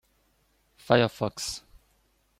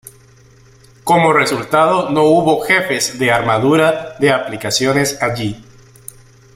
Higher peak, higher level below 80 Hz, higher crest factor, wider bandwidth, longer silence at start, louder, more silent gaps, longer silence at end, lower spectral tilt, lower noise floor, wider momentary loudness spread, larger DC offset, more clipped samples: second, -4 dBFS vs 0 dBFS; second, -60 dBFS vs -50 dBFS; first, 26 dB vs 16 dB; about the same, 16 kHz vs 16 kHz; second, 0.9 s vs 1.05 s; second, -26 LUFS vs -14 LUFS; neither; second, 0.8 s vs 0.95 s; about the same, -4.5 dB/octave vs -4.5 dB/octave; first, -68 dBFS vs -46 dBFS; first, 12 LU vs 7 LU; neither; neither